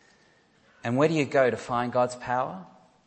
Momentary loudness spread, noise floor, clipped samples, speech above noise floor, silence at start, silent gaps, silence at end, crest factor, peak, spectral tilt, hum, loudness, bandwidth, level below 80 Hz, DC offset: 11 LU; -62 dBFS; under 0.1%; 36 dB; 0.85 s; none; 0.4 s; 20 dB; -8 dBFS; -6 dB/octave; none; -26 LUFS; 8.8 kHz; -66 dBFS; under 0.1%